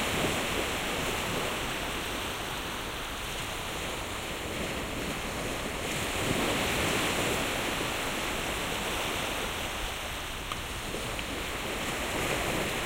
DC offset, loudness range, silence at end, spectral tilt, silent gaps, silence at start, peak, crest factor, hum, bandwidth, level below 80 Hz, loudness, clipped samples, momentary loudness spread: under 0.1%; 4 LU; 0 s; -3 dB/octave; none; 0 s; -14 dBFS; 18 dB; none; 16 kHz; -44 dBFS; -31 LUFS; under 0.1%; 7 LU